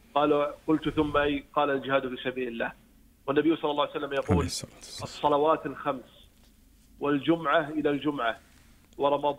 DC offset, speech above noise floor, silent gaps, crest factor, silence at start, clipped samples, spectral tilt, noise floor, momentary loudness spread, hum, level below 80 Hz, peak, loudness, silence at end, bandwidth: under 0.1%; 31 dB; none; 18 dB; 0.15 s; under 0.1%; -5.5 dB/octave; -58 dBFS; 10 LU; none; -52 dBFS; -10 dBFS; -28 LUFS; 0 s; 15.5 kHz